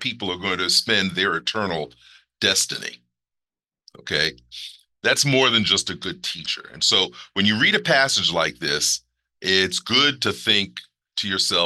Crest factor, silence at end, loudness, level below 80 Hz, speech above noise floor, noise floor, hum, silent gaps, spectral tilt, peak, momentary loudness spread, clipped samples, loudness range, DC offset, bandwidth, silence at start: 20 dB; 0 s; -20 LUFS; -60 dBFS; 68 dB; -90 dBFS; 60 Hz at -75 dBFS; none; -2 dB/octave; -2 dBFS; 13 LU; under 0.1%; 6 LU; under 0.1%; 13 kHz; 0 s